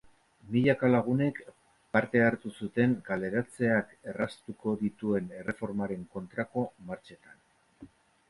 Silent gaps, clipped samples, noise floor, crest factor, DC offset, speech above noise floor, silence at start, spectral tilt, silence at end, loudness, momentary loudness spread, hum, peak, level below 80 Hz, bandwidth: none; under 0.1%; -55 dBFS; 22 dB; under 0.1%; 25 dB; 0.45 s; -8 dB/octave; 0.45 s; -30 LUFS; 12 LU; none; -10 dBFS; -64 dBFS; 11.5 kHz